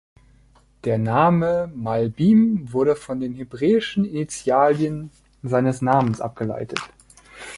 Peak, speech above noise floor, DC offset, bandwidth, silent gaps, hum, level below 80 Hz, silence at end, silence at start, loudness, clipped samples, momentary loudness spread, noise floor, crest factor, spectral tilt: -2 dBFS; 35 dB; under 0.1%; 11.5 kHz; none; none; -54 dBFS; 0 s; 0.85 s; -21 LUFS; under 0.1%; 13 LU; -55 dBFS; 20 dB; -7 dB/octave